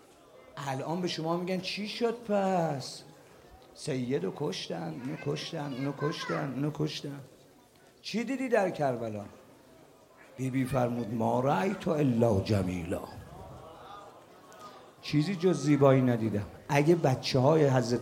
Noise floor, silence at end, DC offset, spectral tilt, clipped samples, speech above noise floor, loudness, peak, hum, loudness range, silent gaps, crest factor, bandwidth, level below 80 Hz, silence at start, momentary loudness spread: -59 dBFS; 0 s; under 0.1%; -6.5 dB/octave; under 0.1%; 30 dB; -30 LUFS; -10 dBFS; none; 7 LU; none; 22 dB; 16.5 kHz; -64 dBFS; 0.55 s; 21 LU